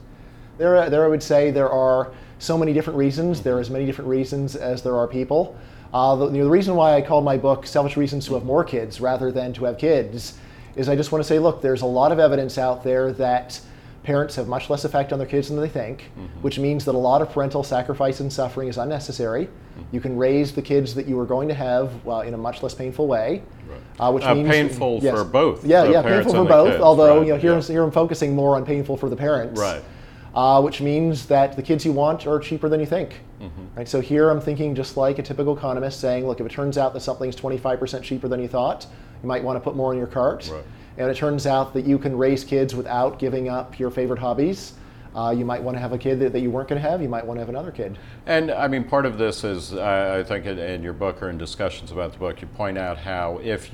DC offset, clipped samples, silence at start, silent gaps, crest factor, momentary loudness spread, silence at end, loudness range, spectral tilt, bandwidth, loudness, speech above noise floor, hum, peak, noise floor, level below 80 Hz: under 0.1%; under 0.1%; 0 s; none; 20 dB; 13 LU; 0 s; 8 LU; -6.5 dB/octave; 15.5 kHz; -21 LUFS; 22 dB; none; 0 dBFS; -42 dBFS; -44 dBFS